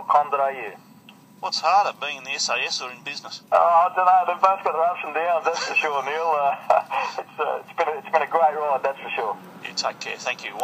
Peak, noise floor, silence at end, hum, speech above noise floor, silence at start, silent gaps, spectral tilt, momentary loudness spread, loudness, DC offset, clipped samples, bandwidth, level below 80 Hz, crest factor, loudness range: 0 dBFS; -49 dBFS; 0 s; none; 26 dB; 0 s; none; -1.5 dB/octave; 12 LU; -22 LUFS; under 0.1%; under 0.1%; 15.5 kHz; -84 dBFS; 22 dB; 4 LU